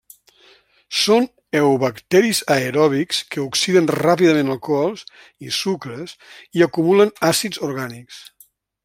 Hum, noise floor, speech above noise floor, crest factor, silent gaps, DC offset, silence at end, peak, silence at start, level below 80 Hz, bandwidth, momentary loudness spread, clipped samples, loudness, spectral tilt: none; -54 dBFS; 36 dB; 18 dB; none; under 0.1%; 0.6 s; -2 dBFS; 0.9 s; -62 dBFS; 16.5 kHz; 16 LU; under 0.1%; -18 LUFS; -4.5 dB/octave